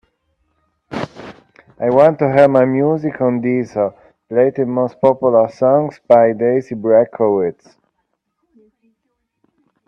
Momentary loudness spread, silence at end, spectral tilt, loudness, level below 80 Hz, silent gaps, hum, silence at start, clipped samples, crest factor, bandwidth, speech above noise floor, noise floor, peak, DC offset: 11 LU; 2.35 s; -9 dB/octave; -15 LUFS; -60 dBFS; none; none; 0.9 s; under 0.1%; 16 dB; 6.8 kHz; 57 dB; -71 dBFS; 0 dBFS; under 0.1%